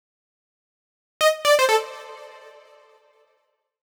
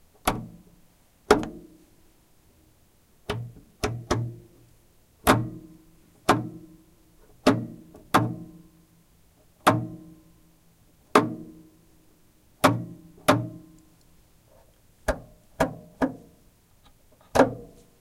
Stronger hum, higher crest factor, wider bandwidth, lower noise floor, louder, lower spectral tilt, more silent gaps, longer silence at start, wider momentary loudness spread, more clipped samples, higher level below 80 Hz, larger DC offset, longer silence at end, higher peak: neither; second, 18 dB vs 28 dB; first, over 20 kHz vs 16 kHz; first, -71 dBFS vs -60 dBFS; first, -19 LUFS vs -26 LUFS; second, 1.5 dB/octave vs -5 dB/octave; neither; first, 1.2 s vs 0.25 s; about the same, 23 LU vs 23 LU; neither; second, -74 dBFS vs -48 dBFS; neither; first, 1.55 s vs 0.35 s; second, -8 dBFS vs 0 dBFS